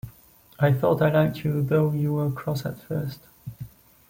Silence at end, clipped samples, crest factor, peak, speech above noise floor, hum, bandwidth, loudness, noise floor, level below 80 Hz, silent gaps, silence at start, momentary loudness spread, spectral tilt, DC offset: 0.4 s; under 0.1%; 16 dB; -8 dBFS; 30 dB; none; 17 kHz; -24 LUFS; -54 dBFS; -56 dBFS; none; 0.05 s; 21 LU; -8.5 dB/octave; under 0.1%